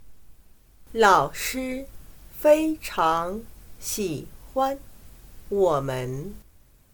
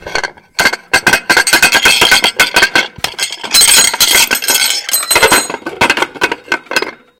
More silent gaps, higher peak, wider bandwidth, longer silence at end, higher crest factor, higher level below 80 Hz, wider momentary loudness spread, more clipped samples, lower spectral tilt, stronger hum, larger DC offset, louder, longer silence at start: neither; second, -4 dBFS vs 0 dBFS; about the same, 19 kHz vs over 20 kHz; first, 0.5 s vs 0.25 s; first, 22 dB vs 12 dB; second, -48 dBFS vs -40 dBFS; first, 17 LU vs 11 LU; second, under 0.1% vs 0.3%; first, -4.5 dB/octave vs 0.5 dB/octave; neither; neither; second, -24 LUFS vs -9 LUFS; about the same, 0 s vs 0.05 s